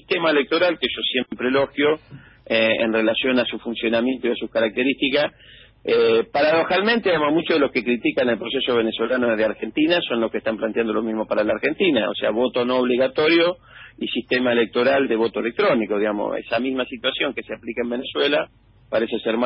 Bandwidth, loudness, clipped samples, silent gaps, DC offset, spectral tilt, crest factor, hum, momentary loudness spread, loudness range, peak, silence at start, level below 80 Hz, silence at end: 5.8 kHz; -21 LUFS; under 0.1%; none; under 0.1%; -9.5 dB/octave; 14 dB; none; 7 LU; 2 LU; -6 dBFS; 0.1 s; -56 dBFS; 0 s